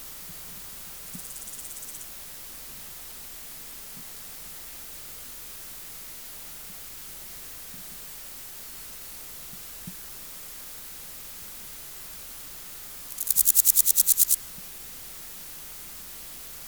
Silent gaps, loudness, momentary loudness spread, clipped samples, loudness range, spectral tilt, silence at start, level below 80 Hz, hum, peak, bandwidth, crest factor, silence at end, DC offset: none; -29 LUFS; 20 LU; under 0.1%; 16 LU; 0.5 dB/octave; 0 s; -58 dBFS; none; -2 dBFS; over 20 kHz; 30 dB; 0 s; 0.1%